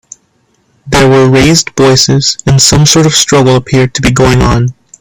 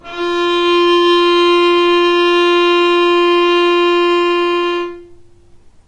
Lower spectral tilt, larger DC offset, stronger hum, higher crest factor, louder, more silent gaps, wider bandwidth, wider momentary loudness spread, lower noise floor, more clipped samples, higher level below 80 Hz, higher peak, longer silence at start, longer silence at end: about the same, -4 dB/octave vs -3 dB/octave; neither; neither; about the same, 8 dB vs 8 dB; first, -6 LUFS vs -12 LUFS; neither; first, over 20 kHz vs 8.8 kHz; about the same, 5 LU vs 6 LU; first, -54 dBFS vs -42 dBFS; first, 0.6% vs under 0.1%; first, -26 dBFS vs -50 dBFS; first, 0 dBFS vs -4 dBFS; first, 0.85 s vs 0.05 s; second, 0.3 s vs 0.75 s